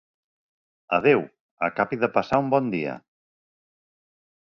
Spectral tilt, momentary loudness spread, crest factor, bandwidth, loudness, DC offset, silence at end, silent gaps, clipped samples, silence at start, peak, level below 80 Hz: -8 dB/octave; 12 LU; 22 dB; 7.2 kHz; -24 LUFS; under 0.1%; 1.6 s; 1.41-1.57 s; under 0.1%; 0.9 s; -4 dBFS; -62 dBFS